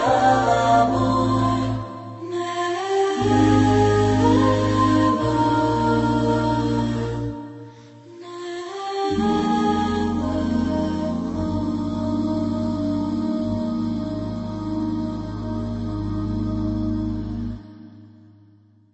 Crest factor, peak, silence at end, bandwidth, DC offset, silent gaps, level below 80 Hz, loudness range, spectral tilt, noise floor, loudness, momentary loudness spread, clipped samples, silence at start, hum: 16 dB; -6 dBFS; 0.85 s; 8.4 kHz; under 0.1%; none; -40 dBFS; 8 LU; -7 dB/octave; -53 dBFS; -22 LUFS; 12 LU; under 0.1%; 0 s; none